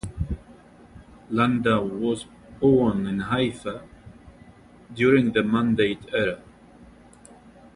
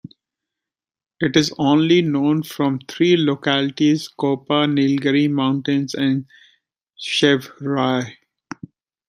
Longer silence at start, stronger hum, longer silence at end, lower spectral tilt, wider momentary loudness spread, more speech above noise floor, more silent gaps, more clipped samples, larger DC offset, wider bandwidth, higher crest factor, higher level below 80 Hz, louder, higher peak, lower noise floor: second, 0.05 s vs 1.2 s; neither; about the same, 0.9 s vs 0.95 s; first, -7 dB/octave vs -5.5 dB/octave; first, 16 LU vs 9 LU; second, 27 dB vs 69 dB; neither; neither; neither; second, 11 kHz vs 15 kHz; about the same, 18 dB vs 18 dB; first, -46 dBFS vs -62 dBFS; second, -23 LUFS vs -19 LUFS; second, -6 dBFS vs -2 dBFS; second, -50 dBFS vs -87 dBFS